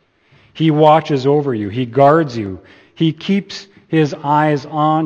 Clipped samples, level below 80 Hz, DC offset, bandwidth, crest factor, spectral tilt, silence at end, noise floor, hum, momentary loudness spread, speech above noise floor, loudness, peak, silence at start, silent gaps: under 0.1%; -58 dBFS; under 0.1%; 7.4 kHz; 16 dB; -7.5 dB/octave; 0 s; -52 dBFS; none; 13 LU; 37 dB; -15 LUFS; 0 dBFS; 0.55 s; none